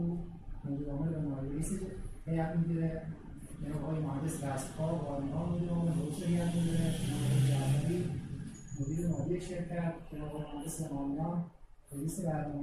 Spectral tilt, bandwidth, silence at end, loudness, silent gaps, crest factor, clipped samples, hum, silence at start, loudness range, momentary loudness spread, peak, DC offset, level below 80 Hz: -7 dB/octave; 13.5 kHz; 0 s; -36 LUFS; none; 16 dB; under 0.1%; none; 0 s; 5 LU; 12 LU; -20 dBFS; under 0.1%; -48 dBFS